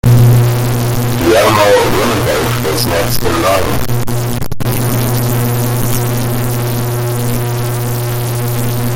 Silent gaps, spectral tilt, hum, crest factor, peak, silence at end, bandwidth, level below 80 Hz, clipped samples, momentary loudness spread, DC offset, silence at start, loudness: none; -5.5 dB/octave; none; 12 dB; 0 dBFS; 0 s; 17 kHz; -28 dBFS; under 0.1%; 8 LU; under 0.1%; 0.05 s; -13 LUFS